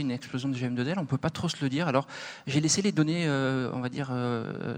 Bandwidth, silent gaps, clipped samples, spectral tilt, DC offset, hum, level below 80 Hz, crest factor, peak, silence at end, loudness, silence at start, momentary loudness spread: 15.5 kHz; none; under 0.1%; -5 dB/octave; under 0.1%; none; -62 dBFS; 20 dB; -10 dBFS; 0 s; -29 LUFS; 0 s; 8 LU